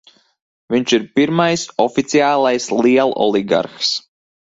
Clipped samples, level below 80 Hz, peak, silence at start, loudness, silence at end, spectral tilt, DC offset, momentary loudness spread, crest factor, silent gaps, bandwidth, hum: under 0.1%; -58 dBFS; 0 dBFS; 0.7 s; -16 LUFS; 0.6 s; -4.5 dB/octave; under 0.1%; 5 LU; 16 dB; none; 7.8 kHz; none